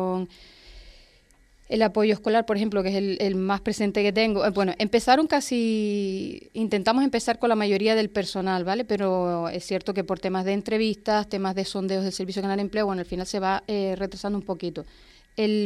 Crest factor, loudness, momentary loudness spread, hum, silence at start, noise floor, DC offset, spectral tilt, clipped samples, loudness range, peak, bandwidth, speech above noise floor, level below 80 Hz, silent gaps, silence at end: 18 dB; -25 LUFS; 8 LU; none; 0 s; -58 dBFS; under 0.1%; -5.5 dB/octave; under 0.1%; 4 LU; -6 dBFS; 13.5 kHz; 33 dB; -54 dBFS; none; 0 s